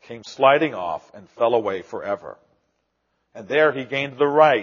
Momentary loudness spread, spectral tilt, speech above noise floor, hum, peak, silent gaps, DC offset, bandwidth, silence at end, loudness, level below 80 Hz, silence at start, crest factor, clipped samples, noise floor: 14 LU; -2.5 dB/octave; 52 dB; none; -2 dBFS; none; under 0.1%; 7.2 kHz; 0 s; -21 LUFS; -70 dBFS; 0.1 s; 20 dB; under 0.1%; -72 dBFS